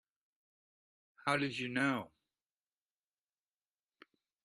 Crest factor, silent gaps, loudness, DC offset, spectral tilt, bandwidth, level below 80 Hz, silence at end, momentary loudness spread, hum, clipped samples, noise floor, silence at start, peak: 24 dB; none; -36 LUFS; under 0.1%; -5 dB/octave; 12.5 kHz; -82 dBFS; 2.35 s; 7 LU; none; under 0.1%; under -90 dBFS; 1.25 s; -18 dBFS